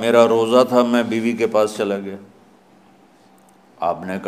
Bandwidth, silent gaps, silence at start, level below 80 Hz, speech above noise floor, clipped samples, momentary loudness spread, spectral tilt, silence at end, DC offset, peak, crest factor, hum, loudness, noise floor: 15 kHz; none; 0 s; -68 dBFS; 34 dB; under 0.1%; 12 LU; -5 dB/octave; 0 s; under 0.1%; 0 dBFS; 18 dB; none; -18 LUFS; -51 dBFS